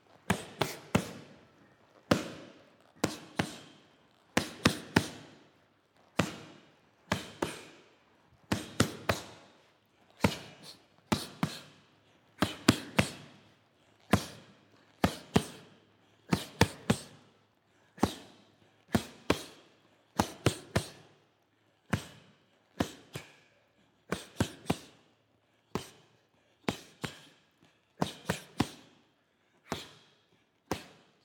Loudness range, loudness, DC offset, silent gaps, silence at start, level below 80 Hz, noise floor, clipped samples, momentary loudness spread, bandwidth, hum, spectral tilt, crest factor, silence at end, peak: 7 LU; -34 LUFS; under 0.1%; none; 0.3 s; -56 dBFS; -71 dBFS; under 0.1%; 21 LU; 19 kHz; none; -4.5 dB/octave; 34 dB; 0.4 s; -4 dBFS